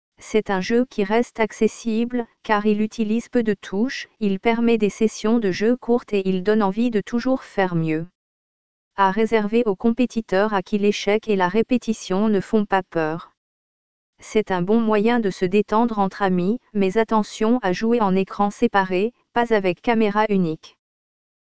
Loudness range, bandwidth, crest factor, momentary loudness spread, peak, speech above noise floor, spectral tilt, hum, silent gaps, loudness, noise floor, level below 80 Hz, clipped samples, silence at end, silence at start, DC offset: 2 LU; 8 kHz; 18 dB; 5 LU; -4 dBFS; over 70 dB; -6.5 dB/octave; none; 8.15-8.91 s, 13.37-14.13 s; -21 LUFS; under -90 dBFS; -54 dBFS; under 0.1%; 0.75 s; 0.1 s; 1%